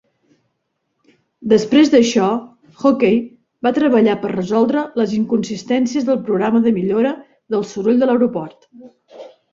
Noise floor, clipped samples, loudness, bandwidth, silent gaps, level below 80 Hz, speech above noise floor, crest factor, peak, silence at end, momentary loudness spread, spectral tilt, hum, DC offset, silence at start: -72 dBFS; under 0.1%; -16 LUFS; 7.6 kHz; none; -58 dBFS; 56 dB; 16 dB; -2 dBFS; 0.25 s; 10 LU; -6 dB/octave; none; under 0.1%; 1.4 s